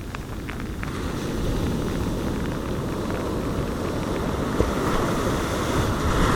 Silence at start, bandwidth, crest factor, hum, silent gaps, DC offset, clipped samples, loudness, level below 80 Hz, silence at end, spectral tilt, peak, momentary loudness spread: 0 s; 18.5 kHz; 20 dB; none; none; under 0.1%; under 0.1%; -26 LUFS; -32 dBFS; 0 s; -6 dB/octave; -4 dBFS; 7 LU